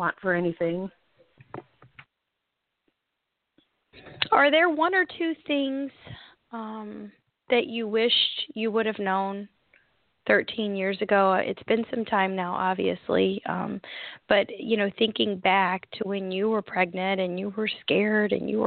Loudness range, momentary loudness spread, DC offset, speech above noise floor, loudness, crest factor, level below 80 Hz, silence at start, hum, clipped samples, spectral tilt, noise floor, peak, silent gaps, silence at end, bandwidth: 3 LU; 17 LU; under 0.1%; 56 dB; -25 LUFS; 22 dB; -68 dBFS; 0 s; none; under 0.1%; -9 dB/octave; -82 dBFS; -6 dBFS; none; 0 s; 4.7 kHz